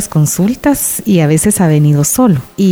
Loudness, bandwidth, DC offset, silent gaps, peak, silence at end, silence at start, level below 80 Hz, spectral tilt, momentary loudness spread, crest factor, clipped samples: -11 LUFS; over 20 kHz; under 0.1%; none; -2 dBFS; 0 s; 0 s; -38 dBFS; -6 dB/octave; 3 LU; 10 dB; under 0.1%